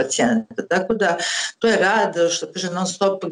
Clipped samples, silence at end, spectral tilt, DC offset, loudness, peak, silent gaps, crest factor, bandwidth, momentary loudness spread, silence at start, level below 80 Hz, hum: under 0.1%; 0 s; -3 dB/octave; under 0.1%; -20 LUFS; -8 dBFS; none; 12 dB; 11.5 kHz; 6 LU; 0 s; -60 dBFS; none